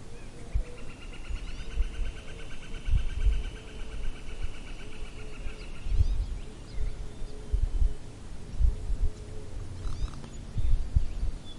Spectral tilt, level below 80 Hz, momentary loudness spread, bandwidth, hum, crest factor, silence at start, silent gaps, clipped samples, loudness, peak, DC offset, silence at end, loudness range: -6 dB/octave; -32 dBFS; 13 LU; 11 kHz; none; 18 dB; 0 s; none; under 0.1%; -37 LUFS; -10 dBFS; under 0.1%; 0 s; 3 LU